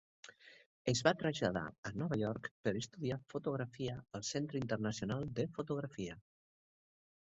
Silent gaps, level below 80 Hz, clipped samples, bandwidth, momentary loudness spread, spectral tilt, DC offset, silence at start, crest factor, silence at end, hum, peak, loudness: 0.66-0.85 s, 1.78-1.83 s, 2.51-2.64 s; -66 dBFS; under 0.1%; 7.6 kHz; 11 LU; -5 dB/octave; under 0.1%; 0.25 s; 26 dB; 1.2 s; none; -14 dBFS; -39 LUFS